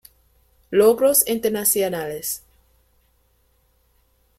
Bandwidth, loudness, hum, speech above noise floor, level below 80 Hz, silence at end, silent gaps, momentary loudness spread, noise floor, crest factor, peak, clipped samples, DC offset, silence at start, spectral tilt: 16.5 kHz; -19 LUFS; none; 44 dB; -58 dBFS; 2 s; none; 12 LU; -63 dBFS; 20 dB; -2 dBFS; under 0.1%; under 0.1%; 0.7 s; -3 dB/octave